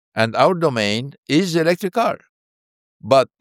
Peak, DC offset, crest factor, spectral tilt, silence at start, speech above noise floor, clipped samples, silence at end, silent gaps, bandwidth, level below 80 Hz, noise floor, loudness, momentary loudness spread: 0 dBFS; under 0.1%; 18 dB; -5.5 dB/octave; 0.15 s; over 72 dB; under 0.1%; 0.15 s; 1.18-1.23 s, 2.29-3.00 s; 16.5 kHz; -66 dBFS; under -90 dBFS; -18 LUFS; 8 LU